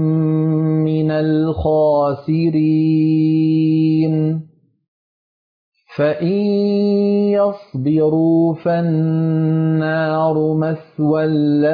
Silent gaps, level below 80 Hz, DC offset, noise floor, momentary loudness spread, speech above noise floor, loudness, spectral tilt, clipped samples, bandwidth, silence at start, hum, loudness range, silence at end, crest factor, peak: 4.88-5.72 s; -46 dBFS; under 0.1%; under -90 dBFS; 4 LU; over 75 dB; -16 LUFS; -11.5 dB/octave; under 0.1%; 5 kHz; 0 s; none; 4 LU; 0 s; 10 dB; -6 dBFS